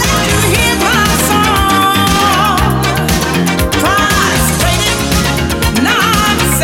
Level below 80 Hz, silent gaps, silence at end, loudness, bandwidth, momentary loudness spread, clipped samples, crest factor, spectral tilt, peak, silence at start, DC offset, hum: -22 dBFS; none; 0 s; -10 LUFS; 17 kHz; 3 LU; under 0.1%; 10 dB; -3.5 dB/octave; 0 dBFS; 0 s; under 0.1%; none